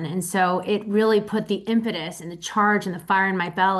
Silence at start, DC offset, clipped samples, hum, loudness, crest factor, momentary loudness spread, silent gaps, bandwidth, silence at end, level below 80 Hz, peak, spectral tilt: 0 s; under 0.1%; under 0.1%; none; -22 LUFS; 14 dB; 8 LU; none; 12.5 kHz; 0 s; -64 dBFS; -8 dBFS; -5 dB/octave